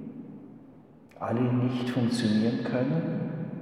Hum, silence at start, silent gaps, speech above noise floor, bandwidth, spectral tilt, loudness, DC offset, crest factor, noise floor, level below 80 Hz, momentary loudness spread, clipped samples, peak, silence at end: none; 0 s; none; 26 dB; 11.5 kHz; -7 dB/octave; -28 LUFS; under 0.1%; 16 dB; -52 dBFS; -70 dBFS; 19 LU; under 0.1%; -12 dBFS; 0 s